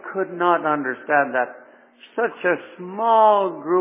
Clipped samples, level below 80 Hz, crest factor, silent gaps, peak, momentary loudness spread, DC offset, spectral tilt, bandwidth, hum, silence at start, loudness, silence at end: under 0.1%; -86 dBFS; 16 dB; none; -4 dBFS; 12 LU; under 0.1%; -9 dB/octave; 3.8 kHz; none; 0.05 s; -20 LUFS; 0 s